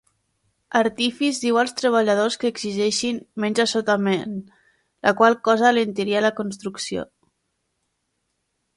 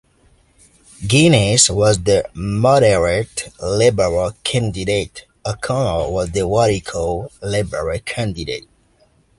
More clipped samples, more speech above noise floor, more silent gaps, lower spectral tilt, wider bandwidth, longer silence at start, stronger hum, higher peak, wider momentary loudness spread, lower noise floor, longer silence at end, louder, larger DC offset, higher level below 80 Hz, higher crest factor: neither; first, 54 dB vs 39 dB; neither; about the same, -4 dB/octave vs -4.5 dB/octave; about the same, 11.5 kHz vs 11.5 kHz; second, 0.7 s vs 1 s; neither; about the same, -2 dBFS vs 0 dBFS; about the same, 12 LU vs 13 LU; first, -74 dBFS vs -56 dBFS; first, 1.75 s vs 0.8 s; second, -21 LUFS vs -17 LUFS; neither; second, -66 dBFS vs -38 dBFS; about the same, 20 dB vs 18 dB